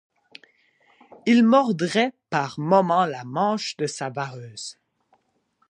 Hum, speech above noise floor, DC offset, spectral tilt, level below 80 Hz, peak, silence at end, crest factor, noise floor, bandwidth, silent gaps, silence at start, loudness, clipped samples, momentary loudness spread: none; 47 dB; under 0.1%; -5.5 dB/octave; -74 dBFS; -4 dBFS; 1 s; 20 dB; -68 dBFS; 10.5 kHz; none; 1.25 s; -22 LUFS; under 0.1%; 16 LU